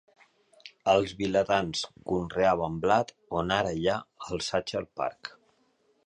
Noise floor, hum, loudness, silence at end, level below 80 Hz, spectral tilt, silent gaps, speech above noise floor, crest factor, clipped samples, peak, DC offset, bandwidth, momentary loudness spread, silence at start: -69 dBFS; none; -28 LUFS; 0.8 s; -54 dBFS; -4.5 dB/octave; none; 41 dB; 20 dB; under 0.1%; -8 dBFS; under 0.1%; 10.5 kHz; 9 LU; 0.65 s